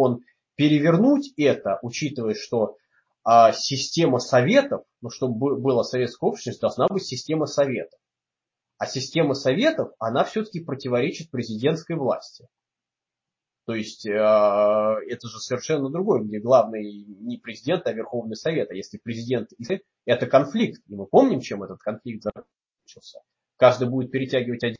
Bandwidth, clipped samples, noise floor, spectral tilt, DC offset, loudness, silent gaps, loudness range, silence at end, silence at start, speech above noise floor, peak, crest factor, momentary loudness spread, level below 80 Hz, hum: 7.6 kHz; under 0.1%; -88 dBFS; -5.5 dB/octave; under 0.1%; -23 LUFS; none; 6 LU; 0.05 s; 0 s; 66 dB; -2 dBFS; 20 dB; 14 LU; -66 dBFS; none